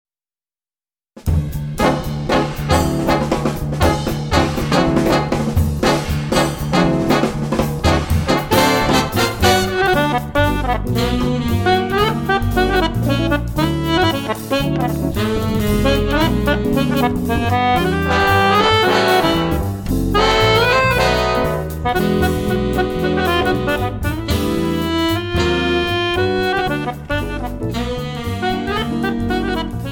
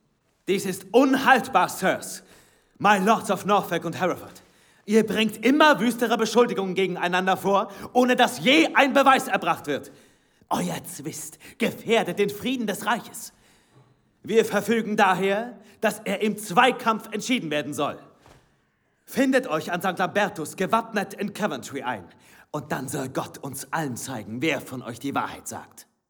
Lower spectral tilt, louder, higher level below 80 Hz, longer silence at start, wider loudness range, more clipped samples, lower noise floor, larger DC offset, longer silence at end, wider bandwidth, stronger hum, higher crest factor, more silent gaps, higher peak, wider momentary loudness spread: first, -5.5 dB/octave vs -4 dB/octave; first, -17 LUFS vs -23 LUFS; first, -28 dBFS vs -68 dBFS; first, 1.15 s vs 0.45 s; second, 4 LU vs 9 LU; neither; first, under -90 dBFS vs -68 dBFS; neither; second, 0 s vs 0.3 s; second, 17.5 kHz vs over 20 kHz; neither; second, 16 dB vs 22 dB; neither; about the same, 0 dBFS vs -2 dBFS; second, 7 LU vs 15 LU